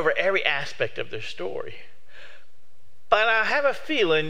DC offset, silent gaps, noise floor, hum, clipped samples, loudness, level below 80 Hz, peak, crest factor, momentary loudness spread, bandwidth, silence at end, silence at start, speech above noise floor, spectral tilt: 3%; none; -64 dBFS; none; under 0.1%; -24 LUFS; -62 dBFS; -4 dBFS; 22 dB; 13 LU; 15.5 kHz; 0 s; 0 s; 40 dB; -4 dB/octave